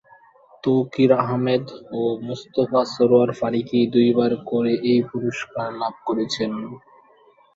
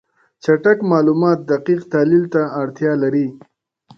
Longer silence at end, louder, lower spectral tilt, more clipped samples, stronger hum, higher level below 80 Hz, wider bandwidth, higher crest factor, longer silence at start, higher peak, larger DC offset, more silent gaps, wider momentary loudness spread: first, 0.8 s vs 0.6 s; second, -21 LUFS vs -17 LUFS; second, -7 dB/octave vs -8.5 dB/octave; neither; neither; about the same, -62 dBFS vs -64 dBFS; first, 7.8 kHz vs 7 kHz; about the same, 18 dB vs 16 dB; first, 0.65 s vs 0.45 s; about the same, -2 dBFS vs -2 dBFS; neither; neither; first, 10 LU vs 7 LU